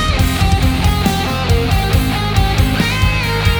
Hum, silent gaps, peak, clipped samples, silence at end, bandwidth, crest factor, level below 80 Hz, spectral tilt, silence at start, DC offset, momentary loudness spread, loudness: none; none; 0 dBFS; under 0.1%; 0 s; over 20 kHz; 14 dB; -18 dBFS; -5 dB/octave; 0 s; under 0.1%; 1 LU; -15 LUFS